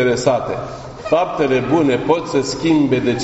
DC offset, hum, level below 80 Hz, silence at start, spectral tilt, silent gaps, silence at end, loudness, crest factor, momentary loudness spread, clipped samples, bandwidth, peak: under 0.1%; none; -44 dBFS; 0 s; -5.5 dB/octave; none; 0 s; -17 LUFS; 16 dB; 10 LU; under 0.1%; 8.2 kHz; 0 dBFS